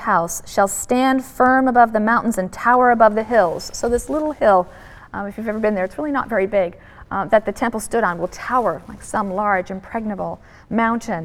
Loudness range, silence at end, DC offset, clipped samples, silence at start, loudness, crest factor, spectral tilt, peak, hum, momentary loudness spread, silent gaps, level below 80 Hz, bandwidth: 6 LU; 0 s; under 0.1%; under 0.1%; 0 s; -19 LUFS; 18 dB; -5 dB/octave; 0 dBFS; none; 12 LU; none; -44 dBFS; 17 kHz